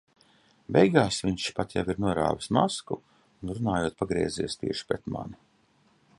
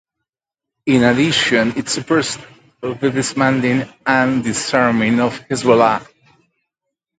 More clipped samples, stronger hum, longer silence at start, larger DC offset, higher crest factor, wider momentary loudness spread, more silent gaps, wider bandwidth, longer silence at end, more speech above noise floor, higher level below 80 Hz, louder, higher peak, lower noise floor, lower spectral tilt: neither; neither; second, 0.7 s vs 0.85 s; neither; about the same, 22 dB vs 18 dB; first, 15 LU vs 10 LU; neither; first, 11.5 kHz vs 9.4 kHz; second, 0.85 s vs 1.15 s; second, 38 dB vs 70 dB; about the same, -52 dBFS vs -52 dBFS; second, -28 LUFS vs -16 LUFS; second, -6 dBFS vs 0 dBFS; second, -65 dBFS vs -86 dBFS; about the same, -5.5 dB/octave vs -4.5 dB/octave